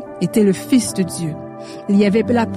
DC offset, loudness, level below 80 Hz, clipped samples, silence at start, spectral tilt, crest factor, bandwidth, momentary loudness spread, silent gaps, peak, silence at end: under 0.1%; -17 LUFS; -52 dBFS; under 0.1%; 0 s; -6 dB/octave; 14 dB; 15 kHz; 15 LU; none; -4 dBFS; 0 s